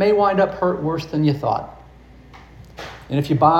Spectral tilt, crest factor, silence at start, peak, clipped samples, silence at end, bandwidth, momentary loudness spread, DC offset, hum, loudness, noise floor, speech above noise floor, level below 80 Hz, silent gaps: -8 dB/octave; 18 dB; 0 s; -2 dBFS; under 0.1%; 0 s; 13.5 kHz; 20 LU; under 0.1%; none; -20 LUFS; -44 dBFS; 27 dB; -46 dBFS; none